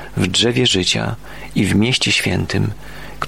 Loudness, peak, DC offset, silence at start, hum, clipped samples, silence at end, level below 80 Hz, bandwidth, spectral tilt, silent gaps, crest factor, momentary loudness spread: -16 LUFS; -2 dBFS; 1%; 0 s; none; under 0.1%; 0 s; -40 dBFS; 16.5 kHz; -4 dB/octave; none; 16 dB; 13 LU